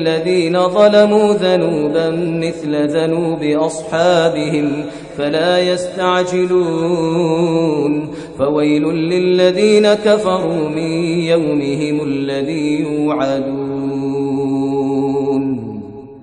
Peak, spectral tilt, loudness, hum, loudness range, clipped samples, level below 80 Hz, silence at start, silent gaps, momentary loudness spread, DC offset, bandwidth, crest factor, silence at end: 0 dBFS; -6 dB/octave; -15 LUFS; none; 4 LU; under 0.1%; -52 dBFS; 0 s; none; 8 LU; under 0.1%; 10 kHz; 14 dB; 0 s